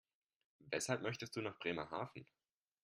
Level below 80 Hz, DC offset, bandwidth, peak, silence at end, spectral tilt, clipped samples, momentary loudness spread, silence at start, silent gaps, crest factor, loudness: -80 dBFS; under 0.1%; 13.5 kHz; -22 dBFS; 0.6 s; -4 dB/octave; under 0.1%; 8 LU; 0.6 s; none; 24 dB; -43 LUFS